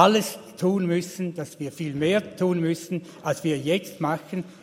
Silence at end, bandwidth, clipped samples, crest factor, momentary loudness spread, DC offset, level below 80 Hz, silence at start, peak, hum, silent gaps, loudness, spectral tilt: 0.1 s; 16 kHz; under 0.1%; 22 dB; 9 LU; under 0.1%; -66 dBFS; 0 s; -2 dBFS; none; none; -26 LUFS; -5.5 dB/octave